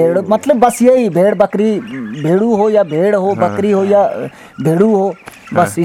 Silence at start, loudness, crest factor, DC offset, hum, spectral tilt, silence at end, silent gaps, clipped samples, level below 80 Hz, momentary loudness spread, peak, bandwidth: 0 s; -13 LUFS; 12 dB; under 0.1%; none; -7 dB/octave; 0 s; none; under 0.1%; -54 dBFS; 9 LU; 0 dBFS; 16.5 kHz